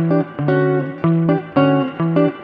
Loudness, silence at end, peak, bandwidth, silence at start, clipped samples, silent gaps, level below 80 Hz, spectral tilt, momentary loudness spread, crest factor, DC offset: -17 LUFS; 0 s; -2 dBFS; 5 kHz; 0 s; under 0.1%; none; -58 dBFS; -11 dB/octave; 3 LU; 14 dB; under 0.1%